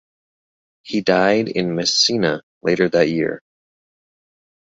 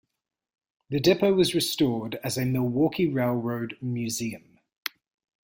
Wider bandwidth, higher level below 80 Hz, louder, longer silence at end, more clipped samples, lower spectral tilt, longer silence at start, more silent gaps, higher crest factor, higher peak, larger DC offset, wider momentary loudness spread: second, 7.8 kHz vs 16.5 kHz; about the same, -58 dBFS vs -60 dBFS; first, -18 LUFS vs -26 LUFS; first, 1.3 s vs 0.55 s; neither; about the same, -4 dB/octave vs -5 dB/octave; about the same, 0.85 s vs 0.9 s; first, 2.43-2.61 s vs 4.77-4.83 s; about the same, 18 dB vs 20 dB; first, -2 dBFS vs -8 dBFS; neither; second, 9 LU vs 14 LU